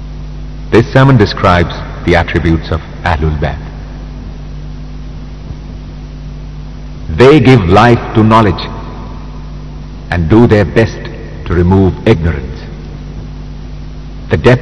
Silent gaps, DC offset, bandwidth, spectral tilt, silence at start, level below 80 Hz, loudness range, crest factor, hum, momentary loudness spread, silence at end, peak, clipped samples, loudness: none; 1%; 10.5 kHz; -7.5 dB/octave; 0 s; -24 dBFS; 11 LU; 12 dB; none; 21 LU; 0 s; 0 dBFS; 3%; -9 LUFS